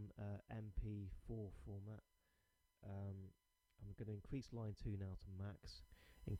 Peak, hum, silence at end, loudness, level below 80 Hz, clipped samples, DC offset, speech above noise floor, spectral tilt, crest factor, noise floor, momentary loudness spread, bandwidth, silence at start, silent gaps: -34 dBFS; none; 0 s; -53 LUFS; -60 dBFS; under 0.1%; under 0.1%; 33 dB; -8 dB/octave; 16 dB; -83 dBFS; 11 LU; 12.5 kHz; 0 s; none